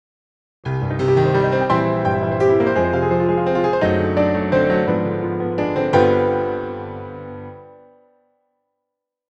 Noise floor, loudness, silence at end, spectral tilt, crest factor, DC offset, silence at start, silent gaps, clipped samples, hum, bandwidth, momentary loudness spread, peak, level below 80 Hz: -80 dBFS; -18 LUFS; 1.6 s; -8.5 dB/octave; 16 dB; under 0.1%; 0.65 s; none; under 0.1%; 50 Hz at -55 dBFS; 8 kHz; 15 LU; -2 dBFS; -48 dBFS